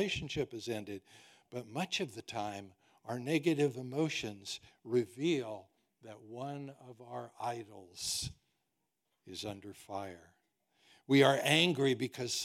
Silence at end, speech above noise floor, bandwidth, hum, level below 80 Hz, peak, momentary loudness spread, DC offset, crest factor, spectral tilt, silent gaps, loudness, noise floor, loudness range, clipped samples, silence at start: 0 s; 49 dB; 16.5 kHz; none; -68 dBFS; -12 dBFS; 21 LU; under 0.1%; 24 dB; -4.5 dB/octave; none; -35 LUFS; -85 dBFS; 10 LU; under 0.1%; 0 s